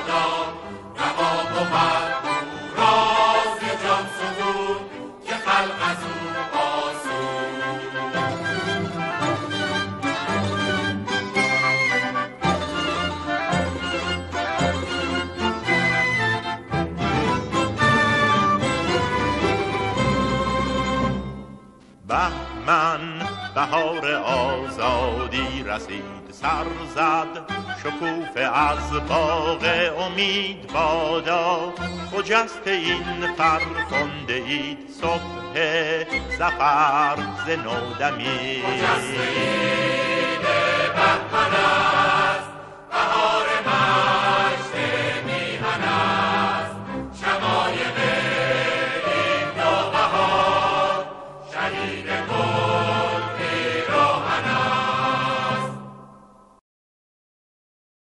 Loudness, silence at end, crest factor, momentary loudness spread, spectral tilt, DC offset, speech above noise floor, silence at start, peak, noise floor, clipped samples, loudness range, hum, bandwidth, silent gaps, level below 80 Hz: -22 LUFS; 1.95 s; 18 dB; 9 LU; -4.5 dB/octave; under 0.1%; 27 dB; 0 s; -4 dBFS; -49 dBFS; under 0.1%; 5 LU; none; 11.5 kHz; none; -44 dBFS